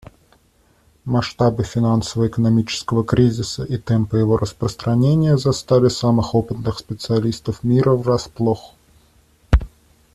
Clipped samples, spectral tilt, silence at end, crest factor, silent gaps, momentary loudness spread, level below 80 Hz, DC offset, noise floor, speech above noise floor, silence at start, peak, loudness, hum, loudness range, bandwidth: under 0.1%; -7 dB/octave; 0.5 s; 16 dB; none; 9 LU; -32 dBFS; under 0.1%; -57 dBFS; 40 dB; 1.05 s; -2 dBFS; -19 LUFS; none; 3 LU; 12.5 kHz